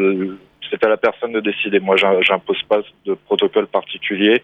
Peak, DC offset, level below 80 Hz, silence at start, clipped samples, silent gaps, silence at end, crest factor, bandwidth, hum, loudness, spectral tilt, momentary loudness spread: -2 dBFS; under 0.1%; -64 dBFS; 0 s; under 0.1%; none; 0.05 s; 16 dB; 8.4 kHz; none; -18 LUFS; -6 dB/octave; 11 LU